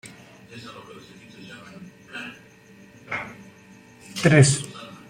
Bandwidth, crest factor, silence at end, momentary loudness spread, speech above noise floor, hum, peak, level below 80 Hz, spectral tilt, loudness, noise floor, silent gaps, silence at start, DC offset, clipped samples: 14.5 kHz; 24 dB; 0.2 s; 28 LU; 26 dB; none; -2 dBFS; -58 dBFS; -5 dB/octave; -20 LUFS; -50 dBFS; none; 0.05 s; under 0.1%; under 0.1%